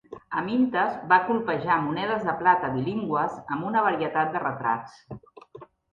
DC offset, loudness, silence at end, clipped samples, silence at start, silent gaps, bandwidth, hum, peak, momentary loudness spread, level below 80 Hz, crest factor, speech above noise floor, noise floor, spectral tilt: under 0.1%; -25 LUFS; 0.3 s; under 0.1%; 0.1 s; none; 7.4 kHz; none; -4 dBFS; 10 LU; -64 dBFS; 22 dB; 23 dB; -48 dBFS; -7.5 dB/octave